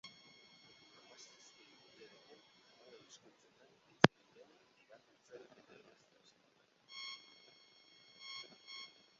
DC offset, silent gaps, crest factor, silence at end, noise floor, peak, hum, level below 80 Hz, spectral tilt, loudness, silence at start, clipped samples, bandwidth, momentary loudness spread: under 0.1%; none; 44 dB; 0.35 s; -73 dBFS; -2 dBFS; none; -80 dBFS; -3.5 dB/octave; -39 LUFS; 0.05 s; under 0.1%; 7.6 kHz; 23 LU